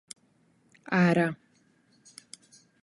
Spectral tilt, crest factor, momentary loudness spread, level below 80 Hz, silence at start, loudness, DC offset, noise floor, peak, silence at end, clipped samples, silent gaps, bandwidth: -6.5 dB/octave; 20 dB; 26 LU; -70 dBFS; 0.9 s; -26 LUFS; under 0.1%; -66 dBFS; -12 dBFS; 1.5 s; under 0.1%; none; 11.5 kHz